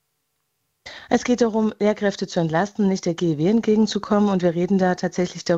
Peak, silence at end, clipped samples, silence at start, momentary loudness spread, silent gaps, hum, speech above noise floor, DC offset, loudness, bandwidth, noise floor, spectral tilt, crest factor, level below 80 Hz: -6 dBFS; 0 s; under 0.1%; 0.85 s; 5 LU; none; none; 54 dB; under 0.1%; -21 LUFS; 8 kHz; -74 dBFS; -6 dB/octave; 16 dB; -56 dBFS